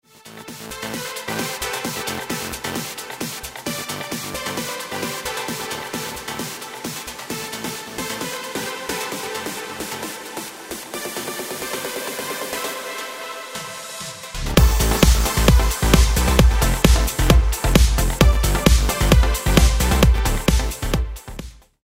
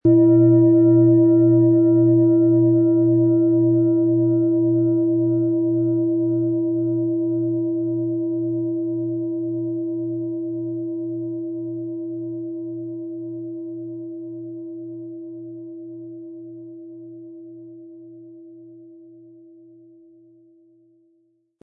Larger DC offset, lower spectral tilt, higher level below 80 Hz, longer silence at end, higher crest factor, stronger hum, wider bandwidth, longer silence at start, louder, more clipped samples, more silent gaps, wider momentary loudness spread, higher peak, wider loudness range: neither; second, -4.5 dB/octave vs -16.5 dB/octave; first, -22 dBFS vs -70 dBFS; second, 0.3 s vs 2.75 s; first, 20 dB vs 14 dB; neither; first, 16.5 kHz vs 1.4 kHz; first, 0.25 s vs 0.05 s; about the same, -21 LUFS vs -19 LUFS; neither; neither; second, 14 LU vs 22 LU; first, 0 dBFS vs -6 dBFS; second, 11 LU vs 22 LU